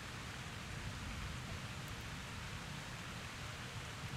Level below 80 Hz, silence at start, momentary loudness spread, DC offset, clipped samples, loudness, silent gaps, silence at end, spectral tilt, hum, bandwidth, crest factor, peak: -56 dBFS; 0 s; 1 LU; under 0.1%; under 0.1%; -46 LUFS; none; 0 s; -4 dB/octave; none; 16 kHz; 14 dB; -34 dBFS